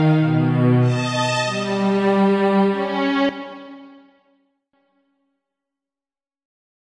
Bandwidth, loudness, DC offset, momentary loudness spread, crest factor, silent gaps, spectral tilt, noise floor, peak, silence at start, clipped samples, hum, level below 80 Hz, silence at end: 10.5 kHz; -18 LUFS; under 0.1%; 11 LU; 14 dB; none; -6.5 dB/octave; under -90 dBFS; -6 dBFS; 0 s; under 0.1%; none; -62 dBFS; 2.95 s